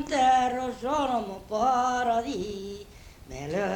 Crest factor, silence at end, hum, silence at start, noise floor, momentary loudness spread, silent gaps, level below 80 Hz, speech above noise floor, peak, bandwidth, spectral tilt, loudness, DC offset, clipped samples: 14 dB; 0 s; none; 0 s; -47 dBFS; 17 LU; none; -52 dBFS; 19 dB; -12 dBFS; 18.5 kHz; -4.5 dB/octave; -27 LUFS; under 0.1%; under 0.1%